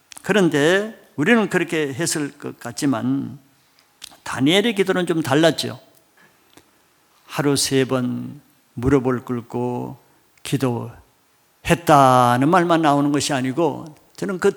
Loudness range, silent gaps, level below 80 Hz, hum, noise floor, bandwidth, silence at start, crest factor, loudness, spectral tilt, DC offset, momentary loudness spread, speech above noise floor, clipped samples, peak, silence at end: 7 LU; none; -50 dBFS; none; -59 dBFS; 19 kHz; 0.25 s; 20 dB; -19 LUFS; -5 dB/octave; under 0.1%; 16 LU; 41 dB; under 0.1%; 0 dBFS; 0 s